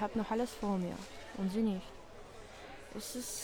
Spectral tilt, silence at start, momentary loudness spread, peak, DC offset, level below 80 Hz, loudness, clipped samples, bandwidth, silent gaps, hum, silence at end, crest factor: -5 dB/octave; 0 s; 18 LU; -22 dBFS; under 0.1%; -58 dBFS; -38 LUFS; under 0.1%; over 20 kHz; none; none; 0 s; 16 dB